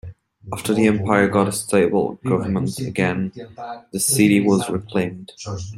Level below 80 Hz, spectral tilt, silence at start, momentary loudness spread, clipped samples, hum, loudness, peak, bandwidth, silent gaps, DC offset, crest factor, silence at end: -54 dBFS; -5 dB/octave; 0.05 s; 16 LU; under 0.1%; none; -19 LUFS; -2 dBFS; 16 kHz; none; under 0.1%; 18 dB; 0 s